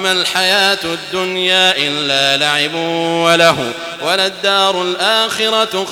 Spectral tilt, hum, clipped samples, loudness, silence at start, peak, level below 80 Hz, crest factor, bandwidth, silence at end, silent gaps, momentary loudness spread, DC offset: -2.5 dB/octave; none; under 0.1%; -13 LUFS; 0 s; 0 dBFS; -58 dBFS; 14 dB; 18.5 kHz; 0 s; none; 8 LU; under 0.1%